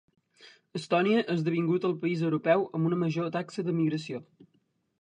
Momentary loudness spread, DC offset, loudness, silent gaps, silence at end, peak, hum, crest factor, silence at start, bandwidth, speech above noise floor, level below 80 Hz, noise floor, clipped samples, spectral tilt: 11 LU; under 0.1%; -28 LUFS; none; 0.8 s; -10 dBFS; none; 20 dB; 0.45 s; 10 kHz; 44 dB; -72 dBFS; -72 dBFS; under 0.1%; -7.5 dB/octave